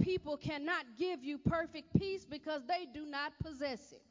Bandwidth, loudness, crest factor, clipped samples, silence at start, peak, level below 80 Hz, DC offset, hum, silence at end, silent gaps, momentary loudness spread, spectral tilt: 7.6 kHz; -39 LUFS; 22 dB; under 0.1%; 0 s; -16 dBFS; -58 dBFS; under 0.1%; none; 0.1 s; none; 6 LU; -6.5 dB/octave